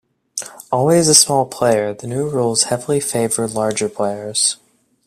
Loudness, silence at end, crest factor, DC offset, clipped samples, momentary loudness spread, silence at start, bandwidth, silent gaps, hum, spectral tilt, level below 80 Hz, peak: -16 LUFS; 0.5 s; 18 dB; under 0.1%; under 0.1%; 15 LU; 0.35 s; 16 kHz; none; none; -3 dB/octave; -56 dBFS; 0 dBFS